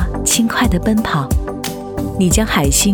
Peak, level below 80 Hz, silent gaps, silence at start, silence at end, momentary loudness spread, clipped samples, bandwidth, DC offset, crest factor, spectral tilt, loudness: 0 dBFS; -24 dBFS; none; 0 s; 0 s; 10 LU; under 0.1%; over 20 kHz; under 0.1%; 14 dB; -4 dB/octave; -16 LUFS